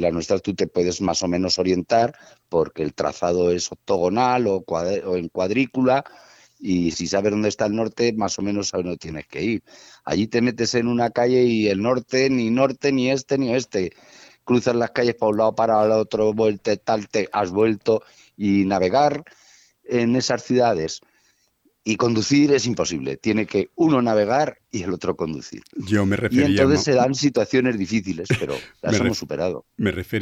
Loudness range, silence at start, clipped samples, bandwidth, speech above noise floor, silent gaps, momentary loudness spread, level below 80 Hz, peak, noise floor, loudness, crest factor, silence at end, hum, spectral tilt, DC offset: 3 LU; 0 s; under 0.1%; 13.5 kHz; 44 dB; none; 8 LU; -54 dBFS; -2 dBFS; -65 dBFS; -21 LUFS; 18 dB; 0 s; none; -5 dB/octave; under 0.1%